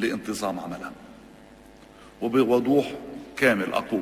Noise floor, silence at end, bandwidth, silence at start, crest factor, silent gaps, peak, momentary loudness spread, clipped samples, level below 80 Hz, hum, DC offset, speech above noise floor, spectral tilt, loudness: -49 dBFS; 0 s; 16 kHz; 0 s; 22 dB; none; -4 dBFS; 16 LU; under 0.1%; -58 dBFS; none; under 0.1%; 25 dB; -5 dB/octave; -25 LUFS